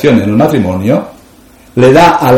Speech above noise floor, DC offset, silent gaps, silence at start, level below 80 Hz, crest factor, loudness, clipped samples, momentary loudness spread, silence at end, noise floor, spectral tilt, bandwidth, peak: 32 dB; under 0.1%; none; 0 s; -38 dBFS; 8 dB; -8 LUFS; 3%; 11 LU; 0 s; -39 dBFS; -6.5 dB/octave; 17 kHz; 0 dBFS